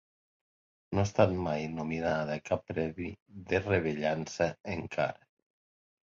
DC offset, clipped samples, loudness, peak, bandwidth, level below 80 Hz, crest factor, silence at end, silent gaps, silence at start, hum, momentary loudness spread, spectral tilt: under 0.1%; under 0.1%; -32 LUFS; -10 dBFS; 7.6 kHz; -54 dBFS; 24 dB; 0.9 s; 3.22-3.26 s, 4.60-4.64 s; 0.9 s; none; 9 LU; -6.5 dB/octave